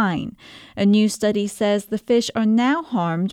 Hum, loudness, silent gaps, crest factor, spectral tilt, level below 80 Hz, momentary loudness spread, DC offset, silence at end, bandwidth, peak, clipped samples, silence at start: none; -20 LUFS; none; 14 dB; -5.5 dB/octave; -58 dBFS; 7 LU; under 0.1%; 0 s; 14 kHz; -6 dBFS; under 0.1%; 0 s